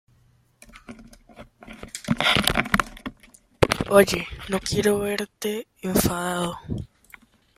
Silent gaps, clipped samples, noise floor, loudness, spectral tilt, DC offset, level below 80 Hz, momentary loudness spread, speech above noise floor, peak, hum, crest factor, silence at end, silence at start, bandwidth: none; under 0.1%; -60 dBFS; -23 LUFS; -4 dB/octave; under 0.1%; -44 dBFS; 23 LU; 37 dB; 0 dBFS; none; 26 dB; 0.7 s; 0.75 s; 16 kHz